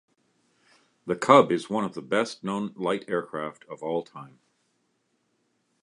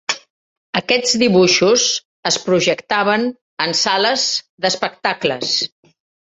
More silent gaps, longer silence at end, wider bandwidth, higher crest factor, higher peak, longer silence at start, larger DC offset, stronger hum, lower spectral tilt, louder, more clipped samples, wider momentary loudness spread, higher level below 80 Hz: second, none vs 0.30-0.73 s, 2.05-2.23 s, 3.41-3.57 s, 4.49-4.58 s; first, 1.55 s vs 0.65 s; first, 11 kHz vs 8.2 kHz; first, 26 dB vs 18 dB; about the same, -2 dBFS vs 0 dBFS; first, 1.05 s vs 0.1 s; neither; neither; first, -5.5 dB/octave vs -2.5 dB/octave; second, -26 LUFS vs -16 LUFS; neither; first, 19 LU vs 10 LU; second, -74 dBFS vs -60 dBFS